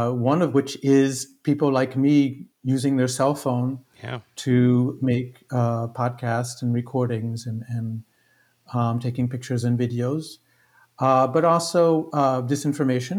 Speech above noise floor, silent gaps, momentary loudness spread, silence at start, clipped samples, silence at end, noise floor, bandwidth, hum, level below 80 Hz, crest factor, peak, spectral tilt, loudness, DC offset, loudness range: 41 dB; none; 11 LU; 0 s; under 0.1%; 0 s; -63 dBFS; 15.5 kHz; none; -70 dBFS; 16 dB; -6 dBFS; -6.5 dB/octave; -23 LUFS; under 0.1%; 6 LU